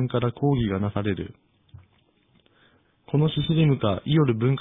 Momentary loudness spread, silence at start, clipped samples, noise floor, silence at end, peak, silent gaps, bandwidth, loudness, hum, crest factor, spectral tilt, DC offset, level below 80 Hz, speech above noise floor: 7 LU; 0 s; under 0.1%; -63 dBFS; 0 s; -8 dBFS; none; 3.9 kHz; -24 LUFS; none; 16 dB; -11 dB/octave; under 0.1%; -50 dBFS; 41 dB